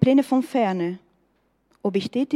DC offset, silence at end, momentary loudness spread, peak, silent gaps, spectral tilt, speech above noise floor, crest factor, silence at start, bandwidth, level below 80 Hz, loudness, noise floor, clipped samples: under 0.1%; 0 s; 11 LU; -4 dBFS; none; -7.5 dB/octave; 45 dB; 20 dB; 0 s; 12.5 kHz; -64 dBFS; -23 LUFS; -67 dBFS; under 0.1%